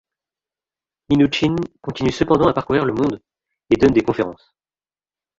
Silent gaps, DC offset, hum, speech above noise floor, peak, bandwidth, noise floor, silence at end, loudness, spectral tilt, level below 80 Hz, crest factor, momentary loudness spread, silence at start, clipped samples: none; under 0.1%; 50 Hz at -50 dBFS; over 72 dB; -2 dBFS; 7.8 kHz; under -90 dBFS; 1.05 s; -18 LUFS; -7 dB/octave; -44 dBFS; 18 dB; 9 LU; 1.1 s; under 0.1%